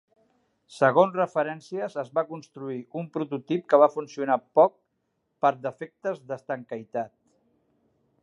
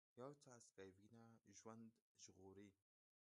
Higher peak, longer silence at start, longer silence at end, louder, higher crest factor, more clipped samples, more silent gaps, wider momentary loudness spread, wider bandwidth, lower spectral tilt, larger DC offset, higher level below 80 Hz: first, -4 dBFS vs -44 dBFS; first, 0.7 s vs 0.15 s; first, 1.15 s vs 0.5 s; first, -26 LUFS vs -65 LUFS; about the same, 22 dB vs 22 dB; neither; second, none vs 2.02-2.15 s; first, 15 LU vs 8 LU; about the same, 10.5 kHz vs 11 kHz; first, -7 dB/octave vs -4.5 dB/octave; neither; first, -82 dBFS vs under -90 dBFS